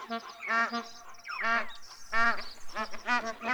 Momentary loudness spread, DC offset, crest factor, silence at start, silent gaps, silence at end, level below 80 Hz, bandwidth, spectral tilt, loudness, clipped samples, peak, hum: 14 LU; under 0.1%; 18 dB; 0 s; none; 0 s; -54 dBFS; over 20 kHz; -2 dB/octave; -31 LUFS; under 0.1%; -12 dBFS; none